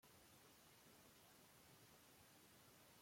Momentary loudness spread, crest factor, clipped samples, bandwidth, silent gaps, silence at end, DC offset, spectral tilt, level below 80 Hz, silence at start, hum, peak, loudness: 0 LU; 14 dB; under 0.1%; 16.5 kHz; none; 0 s; under 0.1%; -2.5 dB/octave; -88 dBFS; 0 s; none; -56 dBFS; -68 LUFS